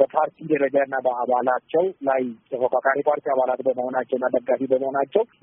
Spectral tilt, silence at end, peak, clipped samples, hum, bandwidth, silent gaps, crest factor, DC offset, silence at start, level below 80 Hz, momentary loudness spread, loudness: 0 dB/octave; 0.2 s; -4 dBFS; under 0.1%; none; 3.8 kHz; none; 18 dB; under 0.1%; 0 s; -72 dBFS; 4 LU; -23 LUFS